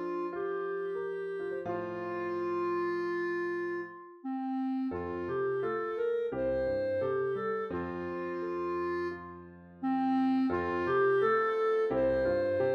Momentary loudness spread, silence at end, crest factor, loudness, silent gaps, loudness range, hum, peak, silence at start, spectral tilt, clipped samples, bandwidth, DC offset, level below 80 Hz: 9 LU; 0 s; 14 dB; -32 LUFS; none; 5 LU; none; -18 dBFS; 0 s; -8 dB/octave; under 0.1%; 6.6 kHz; under 0.1%; -60 dBFS